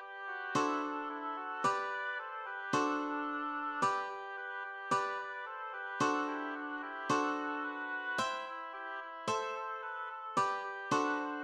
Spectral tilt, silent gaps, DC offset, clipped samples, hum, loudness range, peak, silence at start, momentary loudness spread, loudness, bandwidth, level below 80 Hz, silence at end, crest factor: -3.5 dB/octave; none; under 0.1%; under 0.1%; none; 2 LU; -20 dBFS; 0 s; 9 LU; -37 LUFS; 12.5 kHz; -86 dBFS; 0 s; 18 dB